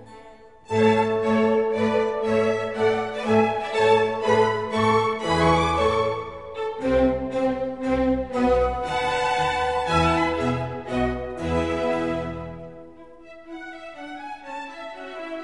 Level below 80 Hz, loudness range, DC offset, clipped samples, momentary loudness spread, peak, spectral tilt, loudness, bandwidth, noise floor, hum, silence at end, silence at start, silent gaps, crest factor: -42 dBFS; 8 LU; 0.3%; under 0.1%; 16 LU; -6 dBFS; -6 dB/octave; -22 LUFS; 11.5 kHz; -47 dBFS; none; 0 s; 0 s; none; 18 dB